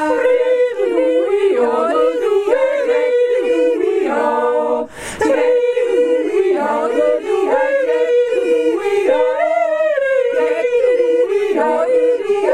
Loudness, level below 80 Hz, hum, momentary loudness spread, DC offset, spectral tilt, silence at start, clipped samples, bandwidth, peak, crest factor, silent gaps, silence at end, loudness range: -15 LUFS; -54 dBFS; none; 2 LU; under 0.1%; -4 dB/octave; 0 s; under 0.1%; 11 kHz; -2 dBFS; 12 dB; none; 0 s; 1 LU